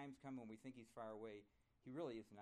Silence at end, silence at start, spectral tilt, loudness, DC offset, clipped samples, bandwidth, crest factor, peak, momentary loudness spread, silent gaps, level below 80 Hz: 0 s; 0 s; -7 dB/octave; -55 LUFS; under 0.1%; under 0.1%; 13 kHz; 18 dB; -38 dBFS; 8 LU; none; -86 dBFS